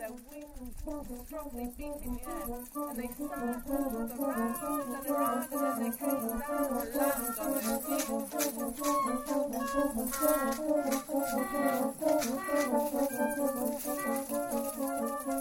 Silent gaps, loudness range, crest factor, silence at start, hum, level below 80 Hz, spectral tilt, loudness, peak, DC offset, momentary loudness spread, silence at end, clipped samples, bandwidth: none; 7 LU; 18 dB; 0 s; none; -52 dBFS; -3.5 dB/octave; -33 LUFS; -14 dBFS; under 0.1%; 10 LU; 0 s; under 0.1%; 17 kHz